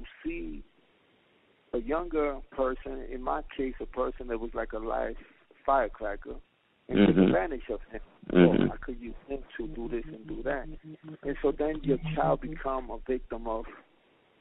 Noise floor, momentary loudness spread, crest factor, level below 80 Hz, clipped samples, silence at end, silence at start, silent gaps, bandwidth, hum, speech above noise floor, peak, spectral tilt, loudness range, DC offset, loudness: -66 dBFS; 18 LU; 24 dB; -44 dBFS; under 0.1%; 0.6 s; 0 s; none; 4 kHz; none; 36 dB; -8 dBFS; -6 dB/octave; 7 LU; under 0.1%; -30 LUFS